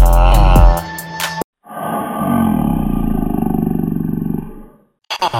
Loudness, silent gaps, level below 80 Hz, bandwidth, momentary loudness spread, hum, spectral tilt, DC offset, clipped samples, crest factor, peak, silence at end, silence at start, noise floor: -17 LUFS; 1.44-1.53 s; -16 dBFS; 16.5 kHz; 15 LU; none; -6.5 dB/octave; under 0.1%; under 0.1%; 14 dB; 0 dBFS; 0 s; 0 s; -37 dBFS